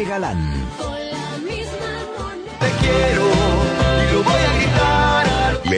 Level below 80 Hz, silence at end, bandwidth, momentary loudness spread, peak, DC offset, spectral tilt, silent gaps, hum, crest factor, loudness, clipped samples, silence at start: -26 dBFS; 0 s; 10.5 kHz; 11 LU; -4 dBFS; under 0.1%; -5.5 dB/octave; none; none; 14 dB; -18 LUFS; under 0.1%; 0 s